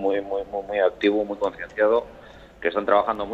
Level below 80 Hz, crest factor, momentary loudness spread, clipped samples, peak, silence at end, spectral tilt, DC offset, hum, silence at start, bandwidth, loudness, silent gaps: -54 dBFS; 18 dB; 8 LU; under 0.1%; -6 dBFS; 0 s; -6 dB/octave; under 0.1%; none; 0 s; 7.8 kHz; -23 LUFS; none